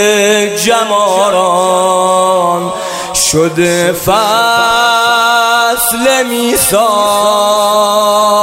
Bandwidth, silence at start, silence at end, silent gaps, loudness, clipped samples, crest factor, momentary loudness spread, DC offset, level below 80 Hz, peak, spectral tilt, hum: 16.5 kHz; 0 s; 0 s; none; -9 LUFS; under 0.1%; 10 dB; 3 LU; under 0.1%; -42 dBFS; 0 dBFS; -2.5 dB/octave; none